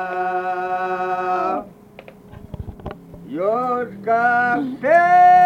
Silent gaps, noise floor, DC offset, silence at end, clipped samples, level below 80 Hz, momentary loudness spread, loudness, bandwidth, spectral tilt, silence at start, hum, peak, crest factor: none; -43 dBFS; under 0.1%; 0 s; under 0.1%; -48 dBFS; 21 LU; -18 LUFS; 6.6 kHz; -6.5 dB/octave; 0 s; none; -4 dBFS; 14 dB